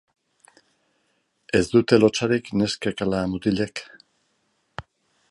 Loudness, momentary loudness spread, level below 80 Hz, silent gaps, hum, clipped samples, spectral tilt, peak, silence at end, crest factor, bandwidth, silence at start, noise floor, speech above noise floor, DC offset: -22 LUFS; 23 LU; -52 dBFS; none; none; under 0.1%; -5.5 dB/octave; -4 dBFS; 0.5 s; 20 dB; 11.5 kHz; 1.55 s; -70 dBFS; 49 dB; under 0.1%